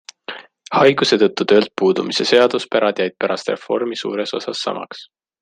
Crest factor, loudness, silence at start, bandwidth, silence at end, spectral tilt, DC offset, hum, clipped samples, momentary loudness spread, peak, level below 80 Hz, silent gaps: 16 dB; -17 LUFS; 0.3 s; 9.6 kHz; 0.35 s; -4.5 dB/octave; under 0.1%; none; under 0.1%; 19 LU; -2 dBFS; -66 dBFS; none